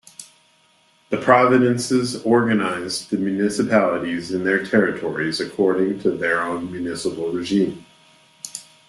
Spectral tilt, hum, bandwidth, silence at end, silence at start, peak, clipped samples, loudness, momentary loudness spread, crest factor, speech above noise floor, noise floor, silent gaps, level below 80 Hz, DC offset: -5 dB/octave; none; 12.5 kHz; 0.25 s; 0.2 s; -2 dBFS; under 0.1%; -20 LUFS; 11 LU; 20 dB; 39 dB; -58 dBFS; none; -60 dBFS; under 0.1%